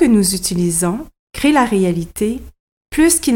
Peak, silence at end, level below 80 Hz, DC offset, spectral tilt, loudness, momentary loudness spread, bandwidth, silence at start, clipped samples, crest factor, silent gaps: -2 dBFS; 0 s; -38 dBFS; under 0.1%; -4.5 dB/octave; -16 LUFS; 12 LU; 17.5 kHz; 0 s; under 0.1%; 14 dB; 1.19-1.27 s, 2.60-2.81 s